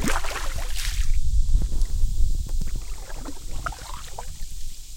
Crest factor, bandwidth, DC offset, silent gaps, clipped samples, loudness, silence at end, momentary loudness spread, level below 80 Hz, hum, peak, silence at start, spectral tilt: 14 dB; 16.5 kHz; under 0.1%; none; under 0.1%; -31 LUFS; 0 s; 11 LU; -24 dBFS; none; -8 dBFS; 0 s; -4 dB/octave